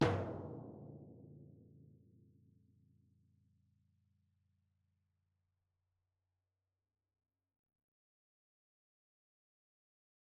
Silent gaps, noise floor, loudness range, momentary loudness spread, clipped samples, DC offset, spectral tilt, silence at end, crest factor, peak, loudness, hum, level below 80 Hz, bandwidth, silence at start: none; under -90 dBFS; 19 LU; 23 LU; under 0.1%; under 0.1%; -5.5 dB/octave; 8.25 s; 32 dB; -18 dBFS; -44 LUFS; none; -72 dBFS; 3.1 kHz; 0 s